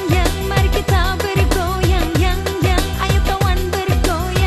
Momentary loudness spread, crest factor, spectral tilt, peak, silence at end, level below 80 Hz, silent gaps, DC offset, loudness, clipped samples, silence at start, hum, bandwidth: 2 LU; 14 dB; -5 dB/octave; 0 dBFS; 0 s; -20 dBFS; none; under 0.1%; -17 LUFS; under 0.1%; 0 s; none; 14 kHz